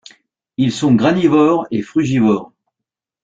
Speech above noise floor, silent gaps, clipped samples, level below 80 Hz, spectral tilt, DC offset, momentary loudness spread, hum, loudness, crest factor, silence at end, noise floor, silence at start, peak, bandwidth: 69 dB; none; under 0.1%; -52 dBFS; -7 dB/octave; under 0.1%; 7 LU; none; -15 LUFS; 14 dB; 0.8 s; -83 dBFS; 0.6 s; -2 dBFS; 9 kHz